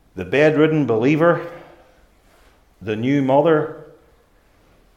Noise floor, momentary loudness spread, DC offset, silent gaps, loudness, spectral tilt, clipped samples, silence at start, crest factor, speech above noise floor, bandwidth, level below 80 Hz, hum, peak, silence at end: -56 dBFS; 17 LU; under 0.1%; none; -17 LUFS; -8 dB/octave; under 0.1%; 0.15 s; 18 dB; 39 dB; 8.6 kHz; -58 dBFS; none; -2 dBFS; 1.15 s